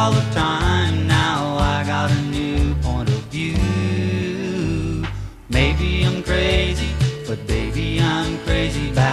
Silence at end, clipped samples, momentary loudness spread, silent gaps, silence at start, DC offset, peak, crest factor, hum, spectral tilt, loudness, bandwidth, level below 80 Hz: 0 s; under 0.1%; 6 LU; none; 0 s; under 0.1%; -2 dBFS; 16 dB; none; -6 dB/octave; -20 LUFS; 13 kHz; -26 dBFS